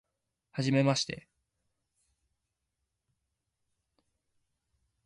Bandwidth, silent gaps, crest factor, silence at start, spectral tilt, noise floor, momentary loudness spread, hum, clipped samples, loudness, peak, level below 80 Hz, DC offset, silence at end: 11.5 kHz; none; 22 dB; 0.55 s; -5 dB/octave; -85 dBFS; 16 LU; none; under 0.1%; -30 LUFS; -16 dBFS; -72 dBFS; under 0.1%; 3.9 s